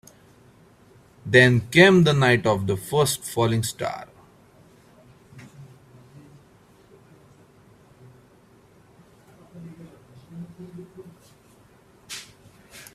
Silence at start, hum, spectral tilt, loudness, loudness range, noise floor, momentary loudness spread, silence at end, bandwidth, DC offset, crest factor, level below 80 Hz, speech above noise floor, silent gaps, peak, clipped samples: 1.25 s; none; -5 dB/octave; -19 LUFS; 26 LU; -55 dBFS; 29 LU; 0.15 s; 15.5 kHz; under 0.1%; 24 dB; -58 dBFS; 36 dB; none; -2 dBFS; under 0.1%